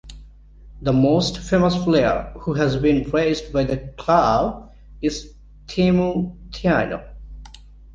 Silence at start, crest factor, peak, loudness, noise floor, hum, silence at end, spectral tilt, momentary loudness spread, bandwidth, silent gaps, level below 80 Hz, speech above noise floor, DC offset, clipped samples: 0.05 s; 18 dB; -2 dBFS; -20 LUFS; -44 dBFS; 50 Hz at -45 dBFS; 0 s; -6.5 dB/octave; 13 LU; 9 kHz; none; -38 dBFS; 25 dB; under 0.1%; under 0.1%